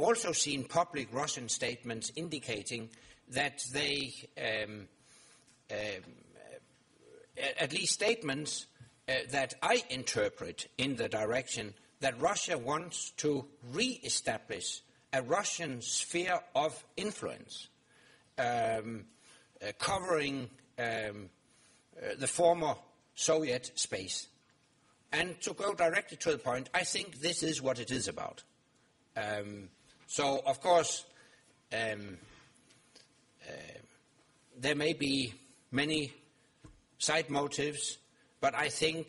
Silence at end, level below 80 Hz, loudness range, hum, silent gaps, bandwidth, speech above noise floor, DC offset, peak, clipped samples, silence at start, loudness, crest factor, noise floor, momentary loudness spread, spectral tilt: 0 s; -68 dBFS; 4 LU; none; none; 11.5 kHz; 35 dB; under 0.1%; -14 dBFS; under 0.1%; 0 s; -34 LUFS; 22 dB; -70 dBFS; 14 LU; -2.5 dB/octave